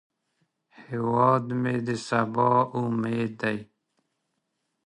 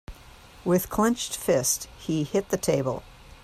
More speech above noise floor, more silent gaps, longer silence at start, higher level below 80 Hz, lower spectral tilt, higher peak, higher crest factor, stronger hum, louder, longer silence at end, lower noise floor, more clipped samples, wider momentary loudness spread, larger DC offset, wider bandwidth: first, 53 dB vs 24 dB; neither; first, 0.8 s vs 0.1 s; second, -68 dBFS vs -50 dBFS; first, -7 dB/octave vs -4.5 dB/octave; about the same, -8 dBFS vs -10 dBFS; about the same, 18 dB vs 18 dB; neither; about the same, -25 LUFS vs -26 LUFS; first, 1.2 s vs 0.1 s; first, -78 dBFS vs -49 dBFS; neither; about the same, 8 LU vs 8 LU; neither; second, 10.5 kHz vs 16 kHz